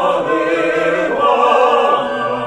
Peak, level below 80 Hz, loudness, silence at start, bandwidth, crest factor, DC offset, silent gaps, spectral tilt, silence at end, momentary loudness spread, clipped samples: 0 dBFS; -52 dBFS; -14 LUFS; 0 s; 10.5 kHz; 14 dB; under 0.1%; none; -4.5 dB/octave; 0 s; 4 LU; under 0.1%